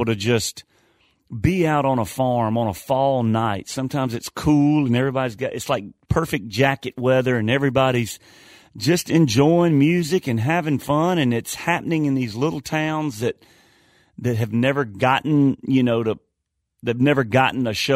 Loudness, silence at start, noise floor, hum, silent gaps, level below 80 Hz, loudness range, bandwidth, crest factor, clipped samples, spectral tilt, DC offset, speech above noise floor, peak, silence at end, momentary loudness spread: -20 LUFS; 0 s; -77 dBFS; none; none; -48 dBFS; 4 LU; 16 kHz; 18 dB; under 0.1%; -6 dB/octave; under 0.1%; 57 dB; -4 dBFS; 0 s; 8 LU